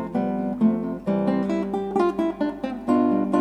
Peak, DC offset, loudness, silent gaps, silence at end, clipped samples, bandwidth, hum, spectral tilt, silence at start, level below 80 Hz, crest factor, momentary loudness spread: -8 dBFS; under 0.1%; -24 LUFS; none; 0 s; under 0.1%; 9.6 kHz; none; -8.5 dB/octave; 0 s; -52 dBFS; 16 dB; 6 LU